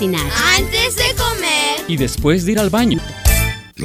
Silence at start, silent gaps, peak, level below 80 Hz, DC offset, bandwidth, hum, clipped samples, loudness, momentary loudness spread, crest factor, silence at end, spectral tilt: 0 s; none; 0 dBFS; -24 dBFS; under 0.1%; 16.5 kHz; none; under 0.1%; -15 LUFS; 5 LU; 16 dB; 0 s; -3.5 dB/octave